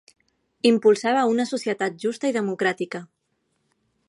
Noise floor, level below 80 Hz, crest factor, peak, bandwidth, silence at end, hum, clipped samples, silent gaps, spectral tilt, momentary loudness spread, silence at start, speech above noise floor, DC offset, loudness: -73 dBFS; -76 dBFS; 18 dB; -6 dBFS; 11.5 kHz; 1.05 s; none; under 0.1%; none; -4.5 dB/octave; 9 LU; 0.65 s; 51 dB; under 0.1%; -22 LUFS